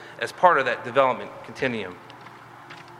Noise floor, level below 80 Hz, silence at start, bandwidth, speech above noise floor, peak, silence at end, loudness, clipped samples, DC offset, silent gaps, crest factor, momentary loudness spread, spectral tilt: -45 dBFS; -70 dBFS; 0 s; 12.5 kHz; 21 dB; -2 dBFS; 0 s; -23 LUFS; under 0.1%; under 0.1%; none; 22 dB; 24 LU; -5 dB/octave